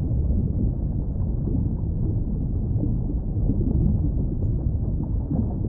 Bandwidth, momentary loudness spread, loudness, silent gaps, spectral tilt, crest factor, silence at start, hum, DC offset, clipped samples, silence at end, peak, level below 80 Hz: 1.4 kHz; 4 LU; -25 LUFS; none; -16.5 dB/octave; 14 dB; 0 s; none; under 0.1%; under 0.1%; 0 s; -10 dBFS; -26 dBFS